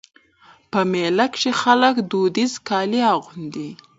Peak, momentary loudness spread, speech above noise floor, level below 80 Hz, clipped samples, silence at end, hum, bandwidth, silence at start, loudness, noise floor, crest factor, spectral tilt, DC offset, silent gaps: 0 dBFS; 14 LU; 33 dB; -66 dBFS; under 0.1%; 0.25 s; none; 8 kHz; 0.75 s; -19 LUFS; -53 dBFS; 20 dB; -4.5 dB/octave; under 0.1%; none